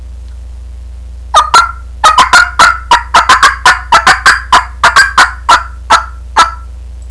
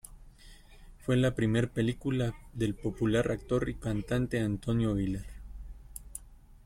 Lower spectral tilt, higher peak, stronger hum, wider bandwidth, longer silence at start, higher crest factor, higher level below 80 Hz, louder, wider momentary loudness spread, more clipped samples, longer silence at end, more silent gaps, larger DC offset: second, -1 dB/octave vs -7 dB/octave; first, 0 dBFS vs -16 dBFS; neither; second, 11 kHz vs 15.5 kHz; about the same, 0 s vs 0.05 s; second, 8 dB vs 16 dB; first, -26 dBFS vs -46 dBFS; first, -6 LUFS vs -31 LUFS; second, 5 LU vs 19 LU; first, 3% vs under 0.1%; about the same, 0 s vs 0.1 s; neither; first, 0.5% vs under 0.1%